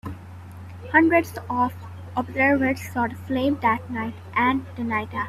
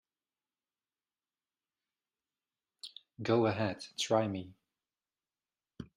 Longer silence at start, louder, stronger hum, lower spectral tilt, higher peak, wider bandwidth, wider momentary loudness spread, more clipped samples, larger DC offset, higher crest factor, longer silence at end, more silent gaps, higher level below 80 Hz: second, 0.05 s vs 2.85 s; first, -23 LUFS vs -33 LUFS; neither; first, -6.5 dB/octave vs -5 dB/octave; first, -2 dBFS vs -14 dBFS; about the same, 14 kHz vs 13 kHz; about the same, 20 LU vs 20 LU; neither; neither; about the same, 20 dB vs 24 dB; about the same, 0 s vs 0.1 s; neither; first, -58 dBFS vs -74 dBFS